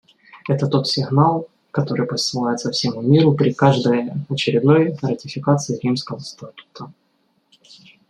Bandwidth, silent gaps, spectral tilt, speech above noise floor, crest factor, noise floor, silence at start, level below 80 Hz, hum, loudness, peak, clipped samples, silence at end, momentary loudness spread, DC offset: 10 kHz; none; -6 dB/octave; 46 dB; 18 dB; -65 dBFS; 0.35 s; -60 dBFS; none; -19 LUFS; 0 dBFS; under 0.1%; 1.2 s; 19 LU; under 0.1%